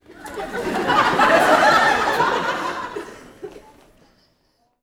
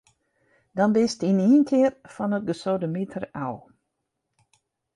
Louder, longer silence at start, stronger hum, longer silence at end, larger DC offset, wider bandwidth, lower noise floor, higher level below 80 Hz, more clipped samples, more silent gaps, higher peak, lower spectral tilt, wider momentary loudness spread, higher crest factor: first, -17 LUFS vs -24 LUFS; second, 0.1 s vs 0.75 s; neither; about the same, 1.25 s vs 1.35 s; neither; first, over 20 kHz vs 11 kHz; second, -65 dBFS vs -80 dBFS; first, -50 dBFS vs -66 dBFS; neither; neither; first, -2 dBFS vs -10 dBFS; second, -3.5 dB/octave vs -7 dB/octave; first, 25 LU vs 14 LU; about the same, 18 dB vs 16 dB